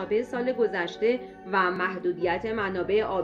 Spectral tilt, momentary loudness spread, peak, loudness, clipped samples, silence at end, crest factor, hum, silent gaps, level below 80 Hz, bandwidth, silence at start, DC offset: -6.5 dB/octave; 3 LU; -10 dBFS; -27 LUFS; under 0.1%; 0 s; 18 dB; none; none; -58 dBFS; 7.4 kHz; 0 s; under 0.1%